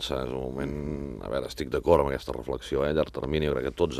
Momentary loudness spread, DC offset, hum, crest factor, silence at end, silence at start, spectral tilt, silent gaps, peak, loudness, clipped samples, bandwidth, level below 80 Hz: 10 LU; under 0.1%; none; 22 dB; 0 s; 0 s; -6 dB/octave; none; -6 dBFS; -29 LUFS; under 0.1%; 14.5 kHz; -42 dBFS